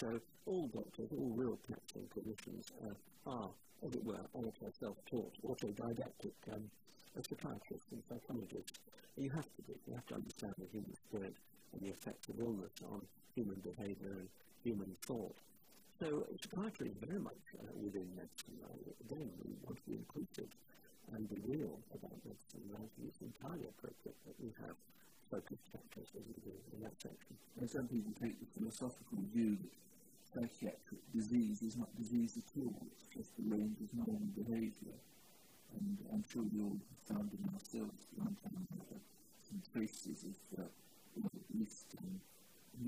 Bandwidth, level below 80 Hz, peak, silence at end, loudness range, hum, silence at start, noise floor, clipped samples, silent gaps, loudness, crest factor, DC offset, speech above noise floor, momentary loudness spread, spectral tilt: 15.5 kHz; -74 dBFS; -28 dBFS; 0 s; 8 LU; none; 0 s; -69 dBFS; under 0.1%; none; -47 LUFS; 18 dB; under 0.1%; 22 dB; 14 LU; -6.5 dB/octave